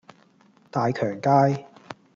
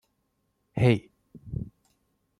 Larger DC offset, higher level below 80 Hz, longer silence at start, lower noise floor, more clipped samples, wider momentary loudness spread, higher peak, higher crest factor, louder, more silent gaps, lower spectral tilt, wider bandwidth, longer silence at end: neither; second, -70 dBFS vs -52 dBFS; about the same, 0.75 s vs 0.75 s; second, -58 dBFS vs -75 dBFS; neither; first, 20 LU vs 15 LU; about the same, -6 dBFS vs -8 dBFS; about the same, 20 dB vs 22 dB; first, -23 LUFS vs -28 LUFS; neither; about the same, -8 dB/octave vs -8 dB/octave; second, 7.4 kHz vs 10.5 kHz; second, 0.2 s vs 0.75 s